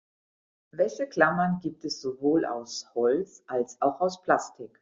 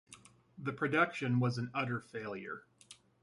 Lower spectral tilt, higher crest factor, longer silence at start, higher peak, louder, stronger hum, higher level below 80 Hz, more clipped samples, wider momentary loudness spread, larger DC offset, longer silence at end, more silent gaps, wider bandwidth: second, -4.5 dB/octave vs -6.5 dB/octave; about the same, 22 dB vs 22 dB; first, 0.75 s vs 0.1 s; first, -6 dBFS vs -16 dBFS; first, -28 LUFS vs -35 LUFS; neither; first, -68 dBFS vs -74 dBFS; neither; second, 10 LU vs 16 LU; neither; second, 0.15 s vs 0.3 s; neither; second, 7.6 kHz vs 11.5 kHz